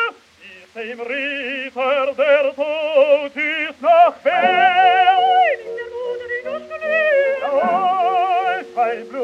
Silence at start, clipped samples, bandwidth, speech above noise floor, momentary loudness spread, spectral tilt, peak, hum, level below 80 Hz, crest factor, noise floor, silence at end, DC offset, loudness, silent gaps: 0 s; under 0.1%; 7.6 kHz; 25 dB; 13 LU; -4 dB/octave; -2 dBFS; none; -66 dBFS; 16 dB; -43 dBFS; 0 s; under 0.1%; -17 LUFS; none